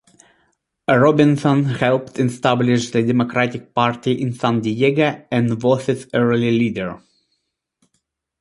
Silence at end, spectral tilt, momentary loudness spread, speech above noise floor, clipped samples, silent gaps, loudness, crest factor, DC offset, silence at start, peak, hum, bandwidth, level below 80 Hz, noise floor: 1.45 s; -6.5 dB/octave; 6 LU; 55 dB; under 0.1%; none; -18 LUFS; 18 dB; under 0.1%; 0.9 s; -2 dBFS; none; 11.5 kHz; -56 dBFS; -72 dBFS